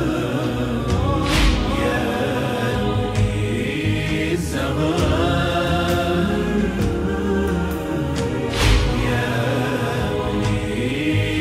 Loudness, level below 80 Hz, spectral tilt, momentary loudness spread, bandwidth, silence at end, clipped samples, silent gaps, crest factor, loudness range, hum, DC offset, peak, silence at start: -21 LUFS; -28 dBFS; -6 dB/octave; 4 LU; 15.5 kHz; 0 s; under 0.1%; none; 16 dB; 1 LU; none; under 0.1%; -4 dBFS; 0 s